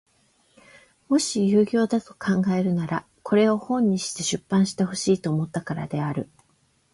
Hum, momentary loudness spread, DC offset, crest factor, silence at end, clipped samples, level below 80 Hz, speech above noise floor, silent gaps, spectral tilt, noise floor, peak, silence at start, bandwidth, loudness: none; 9 LU; under 0.1%; 16 dB; 0.7 s; under 0.1%; -62 dBFS; 42 dB; none; -5.5 dB/octave; -65 dBFS; -8 dBFS; 1.1 s; 11.5 kHz; -24 LUFS